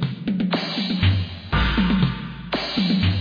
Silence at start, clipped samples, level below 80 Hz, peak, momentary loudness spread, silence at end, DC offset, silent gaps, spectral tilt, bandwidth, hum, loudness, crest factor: 0 s; under 0.1%; -32 dBFS; -8 dBFS; 6 LU; 0 s; under 0.1%; none; -7.5 dB/octave; 5.2 kHz; none; -22 LUFS; 14 dB